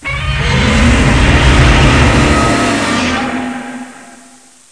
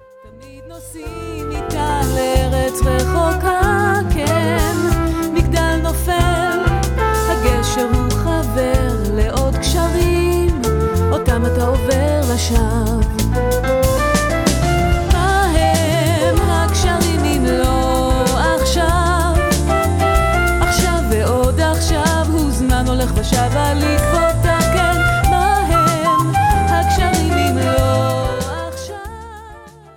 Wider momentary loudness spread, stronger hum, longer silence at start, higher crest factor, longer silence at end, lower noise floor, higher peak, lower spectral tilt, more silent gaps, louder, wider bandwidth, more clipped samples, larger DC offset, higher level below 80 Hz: first, 14 LU vs 4 LU; neither; second, 0 s vs 0.25 s; about the same, 10 dB vs 14 dB; first, 0.55 s vs 0.25 s; about the same, -41 dBFS vs -39 dBFS; about the same, 0 dBFS vs 0 dBFS; about the same, -5 dB/octave vs -5.5 dB/octave; neither; first, -10 LUFS vs -16 LUFS; second, 11 kHz vs 18.5 kHz; neither; first, 0.3% vs under 0.1%; about the same, -16 dBFS vs -20 dBFS